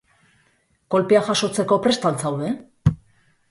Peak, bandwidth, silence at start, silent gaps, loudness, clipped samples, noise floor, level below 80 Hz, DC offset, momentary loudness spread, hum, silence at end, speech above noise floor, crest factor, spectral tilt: -4 dBFS; 11.5 kHz; 0.9 s; none; -21 LUFS; under 0.1%; -63 dBFS; -46 dBFS; under 0.1%; 8 LU; none; 0.55 s; 44 dB; 18 dB; -5.5 dB/octave